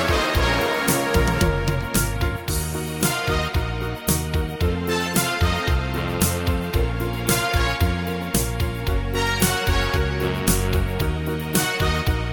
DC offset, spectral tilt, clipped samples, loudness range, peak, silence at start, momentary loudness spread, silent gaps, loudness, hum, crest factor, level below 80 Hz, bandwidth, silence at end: under 0.1%; -4.5 dB/octave; under 0.1%; 1 LU; -4 dBFS; 0 s; 5 LU; none; -22 LUFS; none; 18 dB; -28 dBFS; over 20 kHz; 0 s